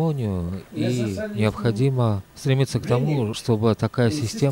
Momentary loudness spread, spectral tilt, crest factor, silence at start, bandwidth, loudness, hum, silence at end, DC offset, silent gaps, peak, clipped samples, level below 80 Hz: 6 LU; -7 dB/octave; 16 dB; 0 s; 16 kHz; -23 LUFS; none; 0 s; under 0.1%; none; -6 dBFS; under 0.1%; -50 dBFS